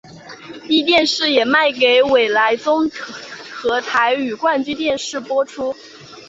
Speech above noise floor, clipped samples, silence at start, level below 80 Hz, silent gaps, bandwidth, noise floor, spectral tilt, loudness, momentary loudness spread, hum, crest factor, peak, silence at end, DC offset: 20 dB; under 0.1%; 0.05 s; -58 dBFS; none; 8 kHz; -36 dBFS; -2.5 dB/octave; -16 LUFS; 18 LU; none; 16 dB; -2 dBFS; 0 s; under 0.1%